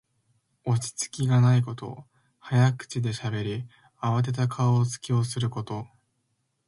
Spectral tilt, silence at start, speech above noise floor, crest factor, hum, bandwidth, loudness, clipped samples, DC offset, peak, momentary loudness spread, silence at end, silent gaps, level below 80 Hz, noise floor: -6 dB/octave; 0.65 s; 50 dB; 16 dB; none; 11.5 kHz; -26 LUFS; under 0.1%; under 0.1%; -10 dBFS; 15 LU; 0.8 s; none; -60 dBFS; -75 dBFS